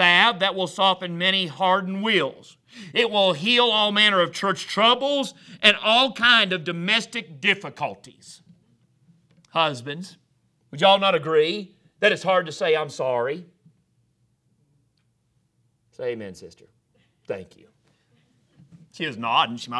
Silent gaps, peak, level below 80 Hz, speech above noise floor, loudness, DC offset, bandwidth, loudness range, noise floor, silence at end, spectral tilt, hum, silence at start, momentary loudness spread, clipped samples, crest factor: none; 0 dBFS; -72 dBFS; 46 dB; -20 LUFS; under 0.1%; 11 kHz; 19 LU; -69 dBFS; 0 s; -3.5 dB/octave; none; 0 s; 16 LU; under 0.1%; 24 dB